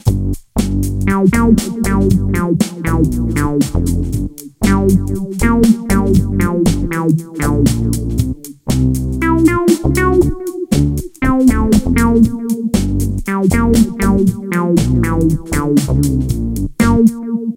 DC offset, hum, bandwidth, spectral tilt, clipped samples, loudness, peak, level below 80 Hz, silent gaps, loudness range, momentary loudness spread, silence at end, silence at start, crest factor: under 0.1%; none; 17 kHz; -6.5 dB/octave; under 0.1%; -14 LUFS; 0 dBFS; -22 dBFS; none; 2 LU; 7 LU; 0 s; 0.05 s; 14 dB